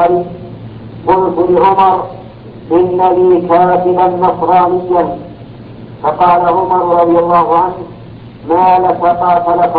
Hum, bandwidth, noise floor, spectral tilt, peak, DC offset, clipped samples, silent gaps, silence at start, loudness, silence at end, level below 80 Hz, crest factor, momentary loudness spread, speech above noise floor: none; 4.8 kHz; -30 dBFS; -11 dB/octave; 0 dBFS; under 0.1%; under 0.1%; none; 0 s; -10 LUFS; 0 s; -42 dBFS; 10 dB; 20 LU; 21 dB